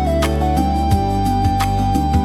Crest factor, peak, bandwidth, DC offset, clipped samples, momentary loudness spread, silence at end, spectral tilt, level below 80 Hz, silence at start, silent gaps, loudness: 12 dB; -2 dBFS; 15.5 kHz; under 0.1%; under 0.1%; 1 LU; 0 s; -6.5 dB/octave; -22 dBFS; 0 s; none; -17 LUFS